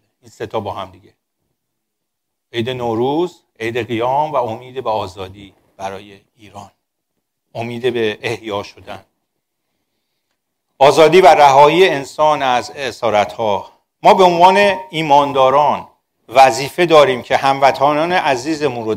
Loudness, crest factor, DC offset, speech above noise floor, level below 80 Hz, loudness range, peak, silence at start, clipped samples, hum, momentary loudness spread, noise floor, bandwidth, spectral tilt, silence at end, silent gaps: -14 LUFS; 16 dB; under 0.1%; 63 dB; -54 dBFS; 13 LU; 0 dBFS; 0.4 s; under 0.1%; none; 19 LU; -77 dBFS; 16 kHz; -4.5 dB/octave; 0 s; none